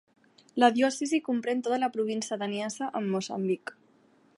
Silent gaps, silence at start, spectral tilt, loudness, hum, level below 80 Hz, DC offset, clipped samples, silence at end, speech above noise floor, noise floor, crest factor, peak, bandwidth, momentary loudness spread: none; 0.55 s; -4.5 dB/octave; -29 LUFS; none; -82 dBFS; under 0.1%; under 0.1%; 0.65 s; 35 dB; -63 dBFS; 22 dB; -8 dBFS; 11.5 kHz; 9 LU